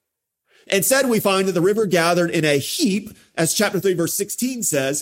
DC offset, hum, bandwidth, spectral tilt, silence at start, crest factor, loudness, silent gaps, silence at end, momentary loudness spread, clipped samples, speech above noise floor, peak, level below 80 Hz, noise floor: under 0.1%; none; 16.5 kHz; -3.5 dB/octave; 0.7 s; 18 dB; -19 LUFS; none; 0 s; 5 LU; under 0.1%; 57 dB; -2 dBFS; -64 dBFS; -76 dBFS